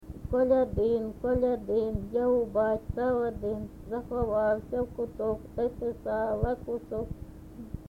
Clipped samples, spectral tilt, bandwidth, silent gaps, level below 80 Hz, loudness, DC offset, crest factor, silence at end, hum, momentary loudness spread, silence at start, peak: under 0.1%; -9 dB/octave; 5.4 kHz; none; -44 dBFS; -30 LUFS; under 0.1%; 16 dB; 0 s; none; 11 LU; 0 s; -14 dBFS